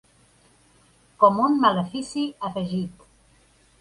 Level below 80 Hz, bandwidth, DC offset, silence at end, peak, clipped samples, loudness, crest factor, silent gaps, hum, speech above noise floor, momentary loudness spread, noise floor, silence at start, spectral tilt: -62 dBFS; 11.5 kHz; under 0.1%; 0.9 s; -4 dBFS; under 0.1%; -22 LUFS; 22 dB; none; none; 37 dB; 12 LU; -58 dBFS; 1.2 s; -6 dB/octave